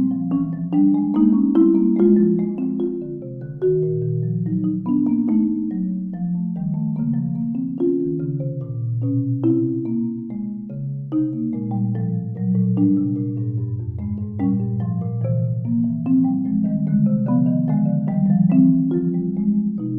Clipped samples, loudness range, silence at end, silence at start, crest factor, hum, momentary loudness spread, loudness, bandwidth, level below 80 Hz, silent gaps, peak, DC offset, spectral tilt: under 0.1%; 5 LU; 0 s; 0 s; 16 dB; none; 10 LU; -20 LUFS; 3.3 kHz; -52 dBFS; none; -4 dBFS; under 0.1%; -14 dB/octave